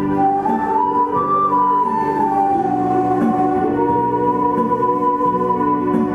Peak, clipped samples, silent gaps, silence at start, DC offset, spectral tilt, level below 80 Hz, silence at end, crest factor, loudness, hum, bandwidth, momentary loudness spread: -6 dBFS; under 0.1%; none; 0 s; under 0.1%; -9 dB/octave; -48 dBFS; 0 s; 12 dB; -17 LUFS; none; 11.5 kHz; 2 LU